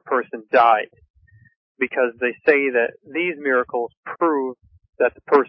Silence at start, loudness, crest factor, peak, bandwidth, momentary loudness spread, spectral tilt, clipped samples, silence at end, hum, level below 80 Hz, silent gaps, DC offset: 0.05 s; -20 LUFS; 18 dB; -2 dBFS; 5.8 kHz; 10 LU; -9 dB/octave; under 0.1%; 0 s; none; -64 dBFS; 1.10-1.14 s, 1.56-1.75 s, 3.97-4.03 s, 4.89-4.93 s; under 0.1%